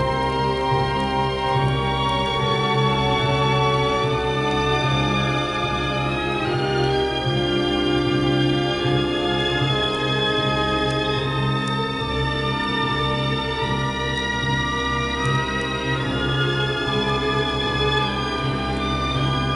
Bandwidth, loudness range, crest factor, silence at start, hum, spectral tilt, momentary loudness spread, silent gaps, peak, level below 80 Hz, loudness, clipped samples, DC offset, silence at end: 11 kHz; 2 LU; 14 dB; 0 s; none; -5.5 dB/octave; 3 LU; none; -6 dBFS; -36 dBFS; -21 LUFS; under 0.1%; under 0.1%; 0 s